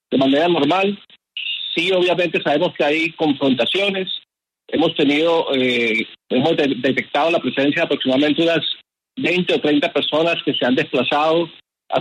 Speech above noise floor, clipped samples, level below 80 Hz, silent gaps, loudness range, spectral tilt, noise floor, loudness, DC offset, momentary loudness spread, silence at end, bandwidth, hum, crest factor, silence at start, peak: 34 dB; under 0.1%; -64 dBFS; none; 1 LU; -5.5 dB/octave; -51 dBFS; -18 LUFS; under 0.1%; 8 LU; 0 s; 11 kHz; none; 14 dB; 0.1 s; -4 dBFS